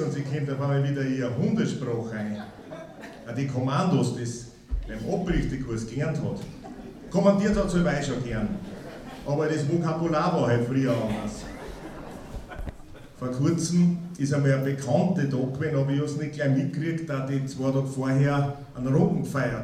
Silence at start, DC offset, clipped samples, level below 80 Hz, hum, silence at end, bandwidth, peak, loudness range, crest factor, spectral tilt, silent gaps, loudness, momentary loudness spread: 0 s; under 0.1%; under 0.1%; -44 dBFS; none; 0 s; 12.5 kHz; -8 dBFS; 4 LU; 18 dB; -7 dB/octave; none; -26 LUFS; 16 LU